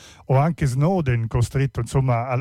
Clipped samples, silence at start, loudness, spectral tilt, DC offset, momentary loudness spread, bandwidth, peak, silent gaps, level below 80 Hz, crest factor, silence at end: under 0.1%; 0.05 s; -21 LUFS; -7.5 dB/octave; under 0.1%; 3 LU; 13 kHz; -8 dBFS; none; -38 dBFS; 12 dB; 0 s